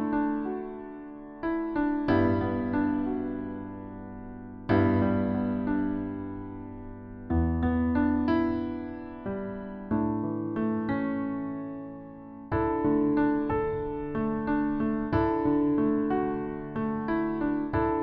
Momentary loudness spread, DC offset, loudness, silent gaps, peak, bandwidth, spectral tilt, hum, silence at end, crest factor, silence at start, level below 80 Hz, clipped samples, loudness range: 16 LU; under 0.1%; -29 LUFS; none; -12 dBFS; 5.2 kHz; -11 dB/octave; none; 0 s; 16 dB; 0 s; -46 dBFS; under 0.1%; 3 LU